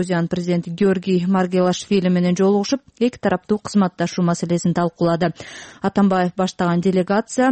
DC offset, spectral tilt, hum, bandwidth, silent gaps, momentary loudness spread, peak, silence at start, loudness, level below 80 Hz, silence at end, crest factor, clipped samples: under 0.1%; -6.5 dB/octave; none; 8.8 kHz; none; 5 LU; -6 dBFS; 0 s; -19 LUFS; -54 dBFS; 0 s; 12 dB; under 0.1%